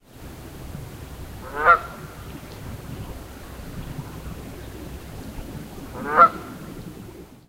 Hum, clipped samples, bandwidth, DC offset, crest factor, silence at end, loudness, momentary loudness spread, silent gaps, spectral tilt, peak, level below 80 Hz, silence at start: none; under 0.1%; 16 kHz; under 0.1%; 26 dB; 0.1 s; -20 LUFS; 22 LU; none; -5.5 dB/octave; 0 dBFS; -42 dBFS; 0.1 s